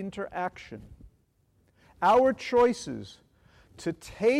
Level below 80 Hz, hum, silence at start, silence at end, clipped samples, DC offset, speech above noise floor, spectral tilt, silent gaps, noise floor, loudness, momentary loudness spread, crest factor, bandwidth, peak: -58 dBFS; none; 0 s; 0 s; under 0.1%; under 0.1%; 41 dB; -5 dB/octave; none; -68 dBFS; -27 LUFS; 23 LU; 16 dB; 12 kHz; -14 dBFS